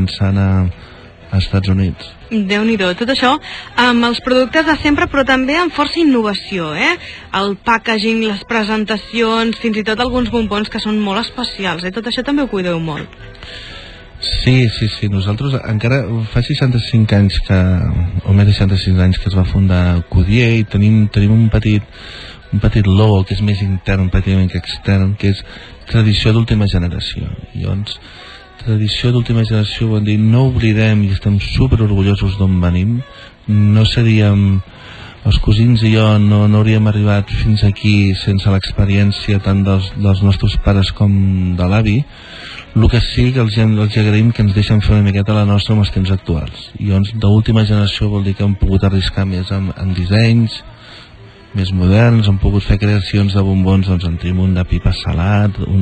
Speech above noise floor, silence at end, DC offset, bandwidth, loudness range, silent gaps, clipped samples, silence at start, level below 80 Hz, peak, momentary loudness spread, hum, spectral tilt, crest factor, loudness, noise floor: 25 dB; 0 s; under 0.1%; 9 kHz; 4 LU; none; under 0.1%; 0 s; -28 dBFS; 0 dBFS; 9 LU; none; -7.5 dB/octave; 12 dB; -14 LUFS; -38 dBFS